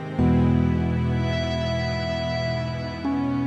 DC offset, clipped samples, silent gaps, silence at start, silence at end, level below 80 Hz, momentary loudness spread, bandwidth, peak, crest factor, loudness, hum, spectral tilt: under 0.1%; under 0.1%; none; 0 s; 0 s; -36 dBFS; 7 LU; 7.8 kHz; -10 dBFS; 12 dB; -24 LUFS; none; -7.5 dB/octave